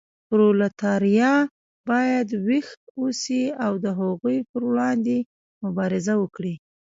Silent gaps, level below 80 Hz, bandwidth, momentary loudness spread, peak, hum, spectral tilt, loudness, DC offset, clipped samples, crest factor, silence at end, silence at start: 1.51-1.84 s, 2.77-2.95 s, 4.49-4.54 s, 5.26-5.61 s; -68 dBFS; 7.8 kHz; 11 LU; -8 dBFS; none; -6 dB/octave; -23 LUFS; under 0.1%; under 0.1%; 14 dB; 0.3 s; 0.3 s